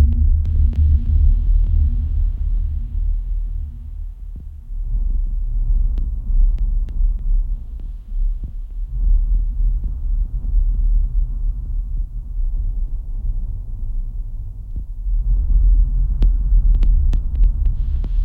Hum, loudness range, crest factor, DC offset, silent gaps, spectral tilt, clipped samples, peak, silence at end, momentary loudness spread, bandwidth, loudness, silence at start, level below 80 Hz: none; 7 LU; 12 dB; under 0.1%; none; -10 dB/octave; under 0.1%; -4 dBFS; 0 s; 14 LU; 0.9 kHz; -23 LUFS; 0 s; -18 dBFS